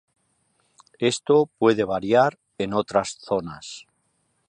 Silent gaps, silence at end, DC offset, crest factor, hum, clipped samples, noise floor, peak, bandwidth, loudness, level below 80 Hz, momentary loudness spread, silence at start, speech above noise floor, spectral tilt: none; 0.7 s; under 0.1%; 18 dB; none; under 0.1%; -70 dBFS; -6 dBFS; 11 kHz; -22 LUFS; -60 dBFS; 16 LU; 1 s; 48 dB; -5 dB/octave